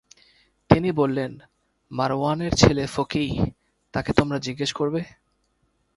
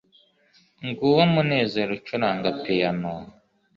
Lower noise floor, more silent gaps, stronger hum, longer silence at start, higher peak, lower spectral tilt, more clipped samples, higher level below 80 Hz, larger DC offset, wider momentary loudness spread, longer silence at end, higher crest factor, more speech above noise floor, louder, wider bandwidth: first, -69 dBFS vs -61 dBFS; neither; neither; about the same, 0.7 s vs 0.8 s; first, 0 dBFS vs -6 dBFS; second, -5.5 dB/octave vs -8 dB/octave; neither; first, -42 dBFS vs -60 dBFS; neither; second, 12 LU vs 15 LU; first, 0.9 s vs 0.45 s; about the same, 24 dB vs 20 dB; first, 46 dB vs 38 dB; about the same, -23 LUFS vs -23 LUFS; first, 11.5 kHz vs 7 kHz